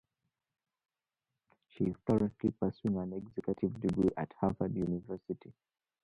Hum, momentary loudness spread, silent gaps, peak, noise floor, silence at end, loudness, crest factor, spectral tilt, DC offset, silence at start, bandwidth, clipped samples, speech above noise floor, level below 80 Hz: none; 9 LU; none; -16 dBFS; under -90 dBFS; 0.55 s; -35 LUFS; 20 dB; -10 dB/octave; under 0.1%; 1.8 s; 8.8 kHz; under 0.1%; over 56 dB; -60 dBFS